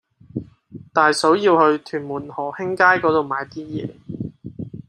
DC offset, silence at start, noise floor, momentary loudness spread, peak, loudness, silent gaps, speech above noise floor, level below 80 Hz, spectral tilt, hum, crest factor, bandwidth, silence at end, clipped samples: under 0.1%; 0.35 s; -42 dBFS; 18 LU; -2 dBFS; -19 LUFS; none; 23 dB; -58 dBFS; -5 dB/octave; none; 18 dB; 13.5 kHz; 0.05 s; under 0.1%